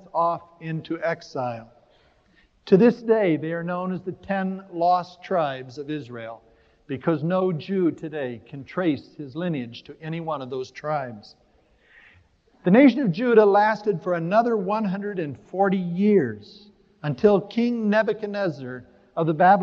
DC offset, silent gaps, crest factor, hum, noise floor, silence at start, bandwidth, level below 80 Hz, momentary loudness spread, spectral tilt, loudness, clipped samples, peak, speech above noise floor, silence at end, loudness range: under 0.1%; none; 20 dB; none; -60 dBFS; 0.15 s; 7 kHz; -64 dBFS; 16 LU; -8.5 dB/octave; -23 LUFS; under 0.1%; -4 dBFS; 38 dB; 0 s; 9 LU